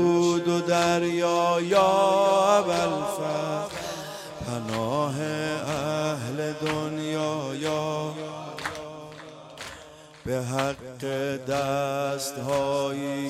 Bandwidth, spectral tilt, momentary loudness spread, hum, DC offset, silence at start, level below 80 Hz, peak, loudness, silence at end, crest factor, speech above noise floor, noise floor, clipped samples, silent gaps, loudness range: 15.5 kHz; -5 dB/octave; 15 LU; none; under 0.1%; 0 s; -60 dBFS; -8 dBFS; -26 LUFS; 0 s; 18 dB; 22 dB; -47 dBFS; under 0.1%; none; 10 LU